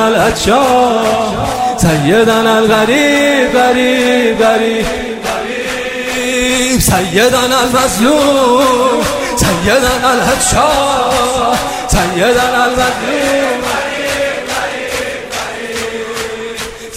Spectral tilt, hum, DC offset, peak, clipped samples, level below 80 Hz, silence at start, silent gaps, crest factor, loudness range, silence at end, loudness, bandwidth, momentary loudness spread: -3.5 dB/octave; none; under 0.1%; 0 dBFS; under 0.1%; -30 dBFS; 0 s; none; 12 dB; 4 LU; 0 s; -11 LUFS; 16.5 kHz; 9 LU